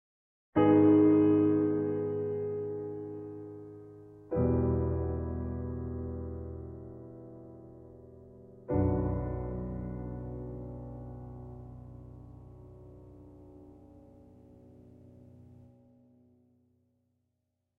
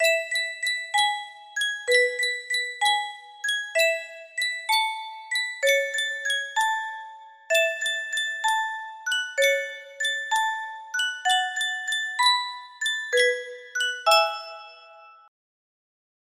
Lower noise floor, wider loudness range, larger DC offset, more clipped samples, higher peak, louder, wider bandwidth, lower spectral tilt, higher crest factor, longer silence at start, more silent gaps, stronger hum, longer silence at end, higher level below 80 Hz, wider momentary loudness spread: first, -82 dBFS vs -49 dBFS; first, 25 LU vs 2 LU; neither; neither; second, -12 dBFS vs -6 dBFS; second, -30 LUFS vs -24 LUFS; second, 3.1 kHz vs 16 kHz; first, -12 dB/octave vs 3.5 dB/octave; about the same, 20 dB vs 20 dB; first, 0.55 s vs 0 s; neither; neither; first, 2.25 s vs 1.15 s; first, -48 dBFS vs -78 dBFS; first, 28 LU vs 12 LU